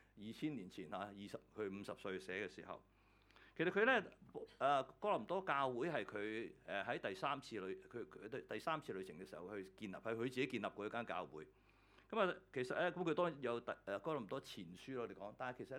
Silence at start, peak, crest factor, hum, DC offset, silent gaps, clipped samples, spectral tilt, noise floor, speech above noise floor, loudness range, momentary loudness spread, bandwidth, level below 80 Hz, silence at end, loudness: 0.15 s; -22 dBFS; 22 dB; none; under 0.1%; none; under 0.1%; -5.5 dB/octave; -70 dBFS; 26 dB; 7 LU; 14 LU; 17.5 kHz; -78 dBFS; 0 s; -44 LUFS